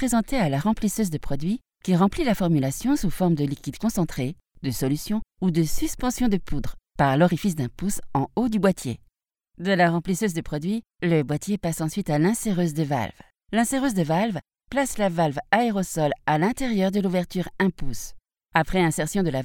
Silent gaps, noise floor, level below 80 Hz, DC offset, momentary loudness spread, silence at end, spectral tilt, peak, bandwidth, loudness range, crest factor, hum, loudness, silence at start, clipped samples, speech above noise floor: none; -67 dBFS; -40 dBFS; under 0.1%; 8 LU; 0 s; -6 dB/octave; -4 dBFS; 18.5 kHz; 2 LU; 20 dB; none; -24 LUFS; 0 s; under 0.1%; 44 dB